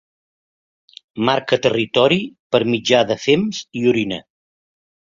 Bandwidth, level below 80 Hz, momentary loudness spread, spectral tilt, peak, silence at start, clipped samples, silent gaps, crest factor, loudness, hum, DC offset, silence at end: 7.6 kHz; -58 dBFS; 8 LU; -5 dB/octave; -2 dBFS; 1.15 s; under 0.1%; 2.39-2.50 s; 18 dB; -18 LUFS; none; under 0.1%; 0.95 s